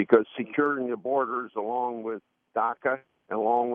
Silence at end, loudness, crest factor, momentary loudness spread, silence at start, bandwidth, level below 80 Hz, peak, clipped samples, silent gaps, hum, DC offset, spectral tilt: 0 s; -28 LUFS; 22 dB; 10 LU; 0 s; 4 kHz; -80 dBFS; -4 dBFS; under 0.1%; none; none; under 0.1%; -4.5 dB/octave